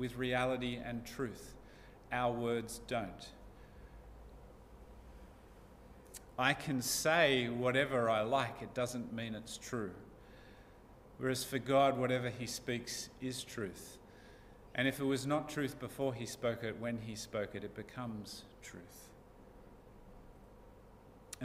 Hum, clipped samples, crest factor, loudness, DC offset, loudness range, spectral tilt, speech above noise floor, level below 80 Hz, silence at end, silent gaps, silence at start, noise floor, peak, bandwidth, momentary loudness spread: none; under 0.1%; 24 dB; -37 LUFS; under 0.1%; 14 LU; -4 dB/octave; 22 dB; -62 dBFS; 0 s; none; 0 s; -59 dBFS; -16 dBFS; 15.5 kHz; 25 LU